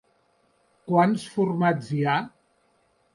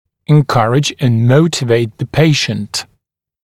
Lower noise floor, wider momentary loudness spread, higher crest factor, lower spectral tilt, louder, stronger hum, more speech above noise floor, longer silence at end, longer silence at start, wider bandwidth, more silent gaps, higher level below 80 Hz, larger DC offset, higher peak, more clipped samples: about the same, -66 dBFS vs -65 dBFS; about the same, 10 LU vs 8 LU; about the same, 18 dB vs 14 dB; first, -7 dB/octave vs -5.5 dB/octave; second, -24 LUFS vs -13 LUFS; neither; second, 43 dB vs 53 dB; first, 0.85 s vs 0.6 s; first, 0.85 s vs 0.3 s; second, 11.5 kHz vs 14 kHz; neither; second, -70 dBFS vs -46 dBFS; neither; second, -10 dBFS vs 0 dBFS; neither